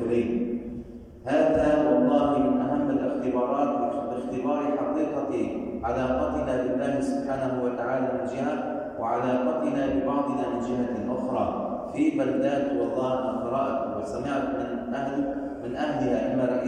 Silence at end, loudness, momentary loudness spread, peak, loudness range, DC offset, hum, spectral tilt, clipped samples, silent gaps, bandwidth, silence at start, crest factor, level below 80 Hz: 0 s; -27 LUFS; 8 LU; -10 dBFS; 4 LU; under 0.1%; none; -7.5 dB/octave; under 0.1%; none; 9.8 kHz; 0 s; 16 dB; -50 dBFS